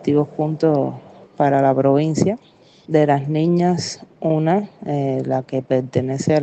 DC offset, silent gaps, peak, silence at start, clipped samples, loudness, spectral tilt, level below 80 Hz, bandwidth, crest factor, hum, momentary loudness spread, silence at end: under 0.1%; none; -2 dBFS; 0 s; under 0.1%; -19 LUFS; -7 dB/octave; -62 dBFS; 8.8 kHz; 16 dB; none; 8 LU; 0 s